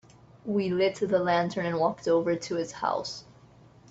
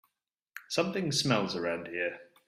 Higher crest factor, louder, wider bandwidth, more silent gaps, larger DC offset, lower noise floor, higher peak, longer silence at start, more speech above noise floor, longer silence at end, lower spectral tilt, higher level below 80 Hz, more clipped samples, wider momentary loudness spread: second, 16 dB vs 22 dB; first, -28 LUFS vs -31 LUFS; second, 8.2 kHz vs 15 kHz; neither; neither; second, -55 dBFS vs -84 dBFS; about the same, -12 dBFS vs -12 dBFS; about the same, 0.45 s vs 0.55 s; second, 28 dB vs 53 dB; first, 0.7 s vs 0.25 s; first, -5.5 dB/octave vs -4 dB/octave; about the same, -66 dBFS vs -70 dBFS; neither; second, 8 LU vs 11 LU